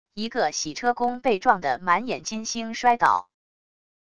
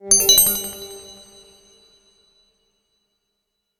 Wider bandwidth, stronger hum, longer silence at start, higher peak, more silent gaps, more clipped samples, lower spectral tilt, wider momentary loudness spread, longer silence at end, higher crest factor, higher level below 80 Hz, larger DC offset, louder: second, 11 kHz vs 19 kHz; neither; about the same, 0.05 s vs 0.05 s; second, -4 dBFS vs 0 dBFS; neither; neither; first, -3 dB/octave vs 0.5 dB/octave; second, 9 LU vs 25 LU; second, 0.65 s vs 2.65 s; about the same, 22 dB vs 22 dB; second, -60 dBFS vs -52 dBFS; first, 0.4% vs under 0.1%; second, -24 LUFS vs -13 LUFS